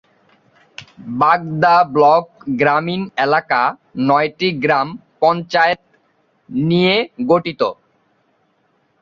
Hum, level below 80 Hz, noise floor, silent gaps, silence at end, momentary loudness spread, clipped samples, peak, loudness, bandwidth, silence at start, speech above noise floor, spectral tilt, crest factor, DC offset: none; -58 dBFS; -62 dBFS; none; 1.3 s; 10 LU; under 0.1%; 0 dBFS; -16 LUFS; 7.2 kHz; 0.8 s; 46 dB; -7 dB/octave; 16 dB; under 0.1%